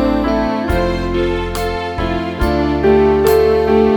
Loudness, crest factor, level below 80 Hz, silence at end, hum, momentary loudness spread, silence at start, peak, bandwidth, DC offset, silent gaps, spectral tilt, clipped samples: -15 LUFS; 14 dB; -26 dBFS; 0 s; none; 8 LU; 0 s; 0 dBFS; over 20 kHz; 0.2%; none; -6.5 dB/octave; under 0.1%